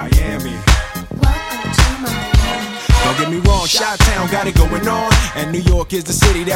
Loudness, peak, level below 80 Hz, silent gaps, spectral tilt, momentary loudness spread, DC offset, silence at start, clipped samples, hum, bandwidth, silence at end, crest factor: -15 LUFS; 0 dBFS; -18 dBFS; none; -4.5 dB/octave; 6 LU; under 0.1%; 0 s; under 0.1%; none; 17 kHz; 0 s; 14 dB